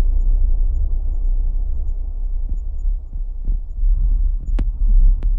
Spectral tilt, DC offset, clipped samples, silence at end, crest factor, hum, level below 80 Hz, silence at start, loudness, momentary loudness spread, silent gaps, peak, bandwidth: -10 dB/octave; under 0.1%; under 0.1%; 0 s; 10 dB; none; -16 dBFS; 0 s; -24 LUFS; 9 LU; none; -6 dBFS; 0.9 kHz